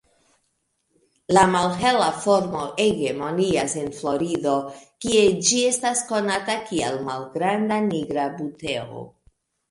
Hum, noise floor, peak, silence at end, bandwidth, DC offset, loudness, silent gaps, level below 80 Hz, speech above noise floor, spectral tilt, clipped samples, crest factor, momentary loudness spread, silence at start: none; -72 dBFS; -2 dBFS; 0.65 s; 11.5 kHz; under 0.1%; -22 LUFS; none; -54 dBFS; 50 dB; -3.5 dB/octave; under 0.1%; 20 dB; 11 LU; 1.3 s